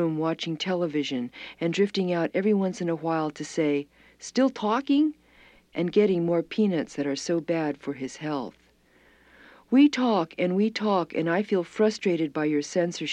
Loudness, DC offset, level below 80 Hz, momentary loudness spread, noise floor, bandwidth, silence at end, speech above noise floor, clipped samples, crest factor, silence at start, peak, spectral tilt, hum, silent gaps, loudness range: -26 LUFS; under 0.1%; -68 dBFS; 9 LU; -60 dBFS; 9.8 kHz; 0 s; 35 dB; under 0.1%; 16 dB; 0 s; -10 dBFS; -6 dB/octave; none; none; 3 LU